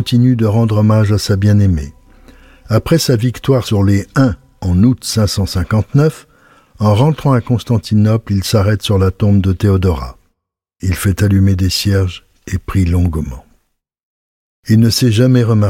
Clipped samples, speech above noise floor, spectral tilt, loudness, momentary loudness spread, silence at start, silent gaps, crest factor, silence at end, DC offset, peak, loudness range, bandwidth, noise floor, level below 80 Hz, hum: under 0.1%; 59 dB; -6.5 dB/octave; -13 LUFS; 9 LU; 0 s; 14.03-14.63 s; 12 dB; 0 s; under 0.1%; -2 dBFS; 3 LU; 16 kHz; -71 dBFS; -32 dBFS; none